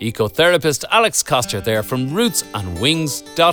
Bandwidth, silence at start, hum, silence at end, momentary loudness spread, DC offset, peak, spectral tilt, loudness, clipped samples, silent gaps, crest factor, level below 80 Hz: over 20 kHz; 0 s; none; 0 s; 7 LU; under 0.1%; -2 dBFS; -3.5 dB/octave; -17 LUFS; under 0.1%; none; 16 dB; -46 dBFS